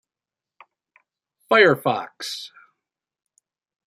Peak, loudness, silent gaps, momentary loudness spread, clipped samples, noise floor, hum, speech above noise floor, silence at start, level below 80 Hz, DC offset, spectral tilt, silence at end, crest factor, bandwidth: -2 dBFS; -19 LUFS; none; 18 LU; under 0.1%; -90 dBFS; none; 70 dB; 1.5 s; -70 dBFS; under 0.1%; -4.5 dB/octave; 1.4 s; 22 dB; 15.5 kHz